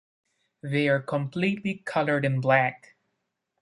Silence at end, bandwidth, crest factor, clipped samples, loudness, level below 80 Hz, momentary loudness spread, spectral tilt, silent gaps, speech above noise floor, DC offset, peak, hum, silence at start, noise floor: 0.85 s; 11.5 kHz; 20 dB; under 0.1%; -26 LUFS; -68 dBFS; 8 LU; -7.5 dB/octave; none; 54 dB; under 0.1%; -8 dBFS; none; 0.65 s; -80 dBFS